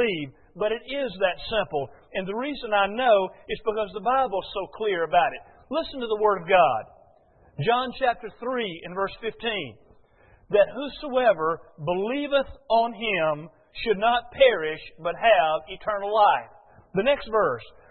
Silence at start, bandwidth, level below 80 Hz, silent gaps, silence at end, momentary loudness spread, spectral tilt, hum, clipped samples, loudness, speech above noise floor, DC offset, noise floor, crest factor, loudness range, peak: 0 s; 4.4 kHz; -54 dBFS; none; 0.2 s; 12 LU; -9 dB/octave; none; under 0.1%; -25 LUFS; 33 dB; under 0.1%; -57 dBFS; 20 dB; 4 LU; -6 dBFS